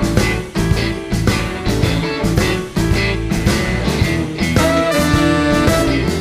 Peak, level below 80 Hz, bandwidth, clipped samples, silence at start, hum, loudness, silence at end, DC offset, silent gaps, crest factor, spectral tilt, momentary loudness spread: -2 dBFS; -24 dBFS; 15.5 kHz; under 0.1%; 0 s; none; -16 LUFS; 0 s; under 0.1%; none; 14 dB; -5.5 dB/octave; 5 LU